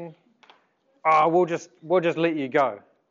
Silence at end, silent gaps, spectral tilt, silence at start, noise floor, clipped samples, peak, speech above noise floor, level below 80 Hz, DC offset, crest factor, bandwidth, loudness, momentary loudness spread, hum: 0.3 s; none; -6 dB/octave; 0 s; -65 dBFS; under 0.1%; -8 dBFS; 43 dB; -82 dBFS; under 0.1%; 18 dB; 7.6 kHz; -23 LUFS; 13 LU; none